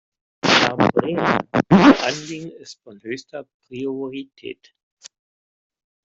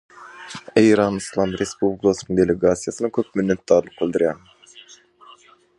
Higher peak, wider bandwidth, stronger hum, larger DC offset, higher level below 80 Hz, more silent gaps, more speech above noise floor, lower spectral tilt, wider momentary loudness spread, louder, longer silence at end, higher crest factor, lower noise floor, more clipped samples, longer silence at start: about the same, -2 dBFS vs -2 dBFS; second, 7.8 kHz vs 11.5 kHz; neither; neither; about the same, -54 dBFS vs -50 dBFS; first, 3.54-3.60 s vs none; first, over 65 dB vs 31 dB; about the same, -5 dB/octave vs -5.5 dB/octave; first, 24 LU vs 8 LU; first, -17 LUFS vs -20 LUFS; first, 1.6 s vs 1 s; about the same, 18 dB vs 20 dB; first, under -90 dBFS vs -50 dBFS; neither; first, 0.45 s vs 0.2 s